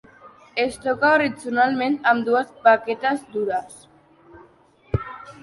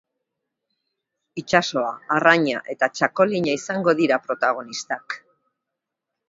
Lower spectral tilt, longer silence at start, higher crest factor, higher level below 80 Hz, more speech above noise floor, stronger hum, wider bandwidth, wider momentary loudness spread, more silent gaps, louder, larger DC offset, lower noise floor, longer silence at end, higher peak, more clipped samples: about the same, -5.5 dB/octave vs -4.5 dB/octave; second, 0.25 s vs 1.35 s; about the same, 20 dB vs 24 dB; first, -48 dBFS vs -66 dBFS; second, 34 dB vs 62 dB; neither; first, 11.5 kHz vs 7.8 kHz; about the same, 11 LU vs 13 LU; neither; about the same, -21 LUFS vs -21 LUFS; neither; second, -54 dBFS vs -83 dBFS; second, 0.1 s vs 1.1 s; about the same, -2 dBFS vs 0 dBFS; neither